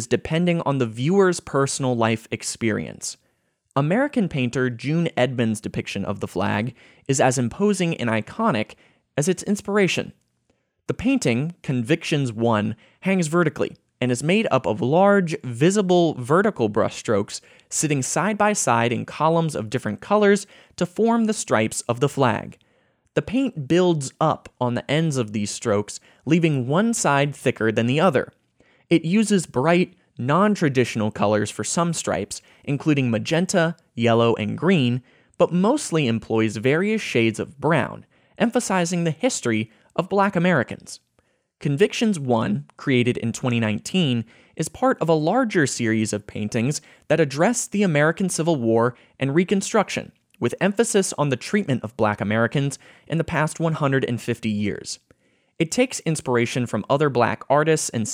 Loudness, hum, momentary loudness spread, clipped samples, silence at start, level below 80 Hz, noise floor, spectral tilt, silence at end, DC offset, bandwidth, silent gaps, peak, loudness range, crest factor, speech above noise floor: -22 LUFS; none; 9 LU; under 0.1%; 0 s; -58 dBFS; -69 dBFS; -5 dB/octave; 0 s; under 0.1%; 16 kHz; none; -4 dBFS; 3 LU; 18 dB; 48 dB